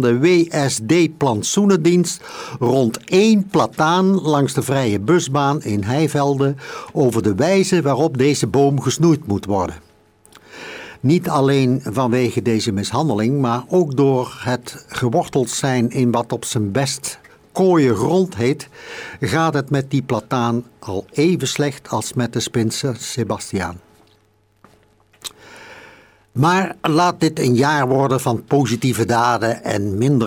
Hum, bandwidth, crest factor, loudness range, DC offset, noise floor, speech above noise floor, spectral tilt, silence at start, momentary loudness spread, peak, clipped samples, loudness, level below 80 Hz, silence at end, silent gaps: none; over 20 kHz; 14 dB; 5 LU; under 0.1%; -58 dBFS; 41 dB; -5.5 dB/octave; 0 s; 10 LU; -4 dBFS; under 0.1%; -18 LUFS; -54 dBFS; 0 s; none